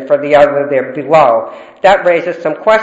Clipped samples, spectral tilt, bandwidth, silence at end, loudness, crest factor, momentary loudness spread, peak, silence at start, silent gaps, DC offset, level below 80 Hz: 0.5%; -5.5 dB/octave; 8 kHz; 0 s; -11 LUFS; 10 dB; 7 LU; 0 dBFS; 0 s; none; under 0.1%; -48 dBFS